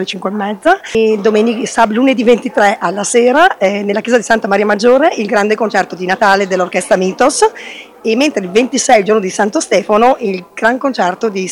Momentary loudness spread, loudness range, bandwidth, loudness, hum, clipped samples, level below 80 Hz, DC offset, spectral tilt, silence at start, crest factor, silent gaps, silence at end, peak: 7 LU; 2 LU; 17 kHz; -12 LUFS; none; under 0.1%; -52 dBFS; under 0.1%; -4 dB/octave; 0 s; 12 dB; none; 0 s; 0 dBFS